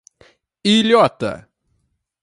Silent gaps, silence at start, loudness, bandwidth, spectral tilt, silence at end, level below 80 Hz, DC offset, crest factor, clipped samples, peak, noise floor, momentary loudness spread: none; 0.65 s; -16 LUFS; 11.5 kHz; -5 dB/octave; 0.8 s; -58 dBFS; under 0.1%; 18 dB; under 0.1%; 0 dBFS; -68 dBFS; 14 LU